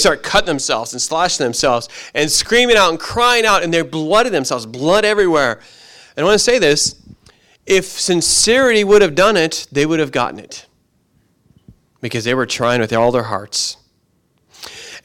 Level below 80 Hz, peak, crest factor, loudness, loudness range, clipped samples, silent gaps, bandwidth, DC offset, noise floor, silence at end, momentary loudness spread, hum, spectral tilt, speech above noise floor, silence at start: -42 dBFS; -2 dBFS; 14 dB; -14 LUFS; 6 LU; under 0.1%; none; 16.5 kHz; under 0.1%; -61 dBFS; 0.05 s; 12 LU; none; -2.5 dB/octave; 46 dB; 0 s